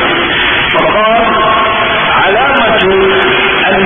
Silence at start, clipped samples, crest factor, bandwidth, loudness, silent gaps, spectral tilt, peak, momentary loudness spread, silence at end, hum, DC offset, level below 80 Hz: 0 s; under 0.1%; 8 dB; 3.8 kHz; -8 LUFS; none; -7 dB/octave; 0 dBFS; 1 LU; 0 s; none; under 0.1%; -32 dBFS